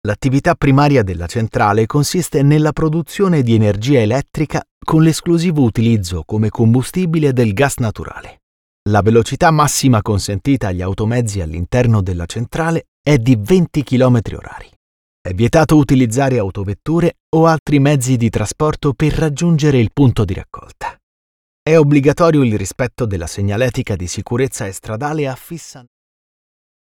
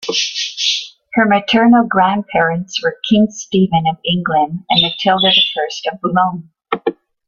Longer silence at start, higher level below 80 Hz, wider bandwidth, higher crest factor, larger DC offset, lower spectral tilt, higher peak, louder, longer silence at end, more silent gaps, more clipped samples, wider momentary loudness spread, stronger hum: about the same, 0.05 s vs 0 s; first, -36 dBFS vs -52 dBFS; first, 17 kHz vs 7.2 kHz; about the same, 14 dB vs 14 dB; neither; first, -6.5 dB/octave vs -4 dB/octave; about the same, 0 dBFS vs 0 dBFS; about the same, -15 LUFS vs -14 LUFS; first, 1.05 s vs 0.35 s; first, 4.71-4.81 s, 8.43-8.86 s, 12.88-13.04 s, 14.76-15.25 s, 17.20-17.32 s, 17.59-17.66 s, 21.03-21.66 s vs none; neither; about the same, 11 LU vs 10 LU; neither